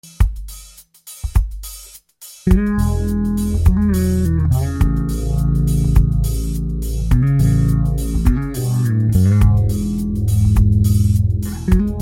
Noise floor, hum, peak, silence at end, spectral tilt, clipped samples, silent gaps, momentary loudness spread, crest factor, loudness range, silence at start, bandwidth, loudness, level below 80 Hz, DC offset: -41 dBFS; none; 0 dBFS; 0 s; -7.5 dB/octave; under 0.1%; none; 9 LU; 16 dB; 3 LU; 0.05 s; 16.5 kHz; -17 LUFS; -20 dBFS; under 0.1%